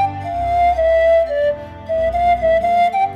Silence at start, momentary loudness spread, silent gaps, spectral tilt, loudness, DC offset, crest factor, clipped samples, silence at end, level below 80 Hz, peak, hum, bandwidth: 0 s; 7 LU; none; -6 dB/octave; -16 LUFS; under 0.1%; 8 dB; under 0.1%; 0 s; -34 dBFS; -6 dBFS; none; 8.4 kHz